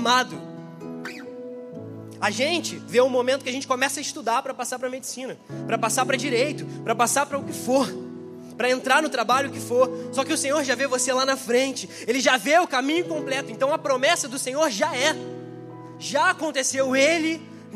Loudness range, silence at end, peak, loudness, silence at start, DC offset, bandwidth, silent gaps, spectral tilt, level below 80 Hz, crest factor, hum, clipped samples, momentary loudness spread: 3 LU; 0 s; -4 dBFS; -23 LUFS; 0 s; under 0.1%; 15.5 kHz; none; -2.5 dB/octave; -76 dBFS; 20 dB; none; under 0.1%; 17 LU